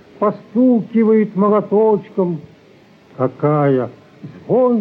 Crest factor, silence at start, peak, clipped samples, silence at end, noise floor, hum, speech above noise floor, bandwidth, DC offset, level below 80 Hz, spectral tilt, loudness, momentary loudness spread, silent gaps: 12 dB; 0.2 s; -4 dBFS; under 0.1%; 0 s; -47 dBFS; none; 32 dB; 4.8 kHz; under 0.1%; -64 dBFS; -11 dB/octave; -16 LUFS; 8 LU; none